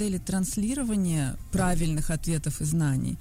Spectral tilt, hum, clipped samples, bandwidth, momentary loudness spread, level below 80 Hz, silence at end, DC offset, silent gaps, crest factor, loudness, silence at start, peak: -5.5 dB/octave; none; under 0.1%; 16 kHz; 3 LU; -36 dBFS; 0 s; under 0.1%; none; 12 dB; -28 LUFS; 0 s; -14 dBFS